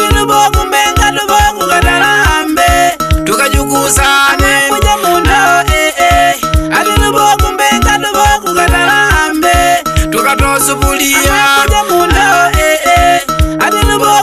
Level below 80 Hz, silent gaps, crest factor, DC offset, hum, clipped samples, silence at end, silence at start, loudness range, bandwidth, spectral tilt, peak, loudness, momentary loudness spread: -18 dBFS; none; 8 dB; under 0.1%; none; under 0.1%; 0 s; 0 s; 1 LU; 14.5 kHz; -3.5 dB/octave; 0 dBFS; -8 LUFS; 3 LU